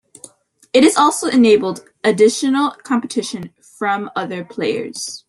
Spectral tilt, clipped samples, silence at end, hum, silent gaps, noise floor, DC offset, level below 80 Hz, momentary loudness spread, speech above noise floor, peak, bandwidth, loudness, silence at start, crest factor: -4 dB/octave; under 0.1%; 0.1 s; none; none; -44 dBFS; under 0.1%; -62 dBFS; 13 LU; 28 dB; 0 dBFS; 12.5 kHz; -16 LUFS; 0.75 s; 16 dB